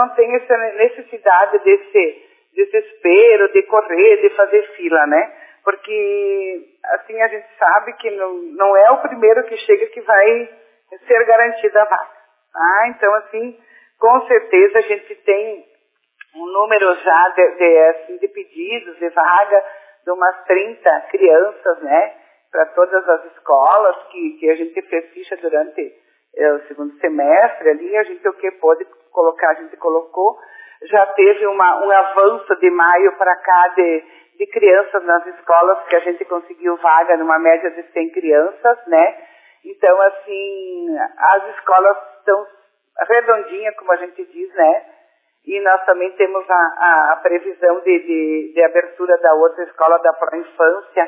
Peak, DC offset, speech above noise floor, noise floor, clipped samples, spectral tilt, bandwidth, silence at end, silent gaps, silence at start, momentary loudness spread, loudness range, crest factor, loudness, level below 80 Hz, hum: 0 dBFS; under 0.1%; 47 dB; -61 dBFS; under 0.1%; -6.5 dB/octave; 3.8 kHz; 0 s; none; 0 s; 13 LU; 4 LU; 14 dB; -14 LUFS; -78 dBFS; none